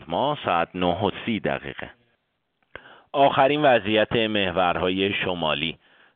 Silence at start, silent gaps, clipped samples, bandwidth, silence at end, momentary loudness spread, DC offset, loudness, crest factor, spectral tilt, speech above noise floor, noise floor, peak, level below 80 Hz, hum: 0 s; none; under 0.1%; 4.6 kHz; 0.4 s; 11 LU; under 0.1%; -22 LUFS; 18 dB; -3 dB/octave; 50 dB; -73 dBFS; -6 dBFS; -54 dBFS; none